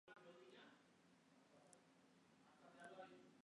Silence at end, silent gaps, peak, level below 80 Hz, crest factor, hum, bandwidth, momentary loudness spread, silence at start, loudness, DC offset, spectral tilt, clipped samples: 0.05 s; none; -46 dBFS; under -90 dBFS; 22 dB; none; 10 kHz; 7 LU; 0.05 s; -64 LUFS; under 0.1%; -4 dB/octave; under 0.1%